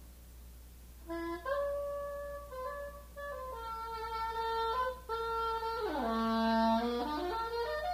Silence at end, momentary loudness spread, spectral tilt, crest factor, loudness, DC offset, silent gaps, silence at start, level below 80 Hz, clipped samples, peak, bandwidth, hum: 0 s; 19 LU; -5.5 dB/octave; 16 dB; -36 LUFS; under 0.1%; none; 0 s; -52 dBFS; under 0.1%; -20 dBFS; 16.5 kHz; 60 Hz at -55 dBFS